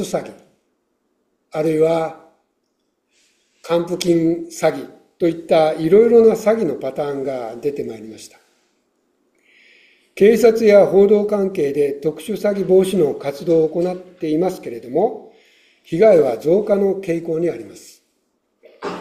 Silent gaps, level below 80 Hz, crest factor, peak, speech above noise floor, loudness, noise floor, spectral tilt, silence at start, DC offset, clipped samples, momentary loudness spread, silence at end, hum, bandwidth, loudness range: none; -58 dBFS; 16 dB; -2 dBFS; 53 dB; -17 LUFS; -70 dBFS; -6.5 dB/octave; 0 s; under 0.1%; under 0.1%; 17 LU; 0 s; none; 14.5 kHz; 8 LU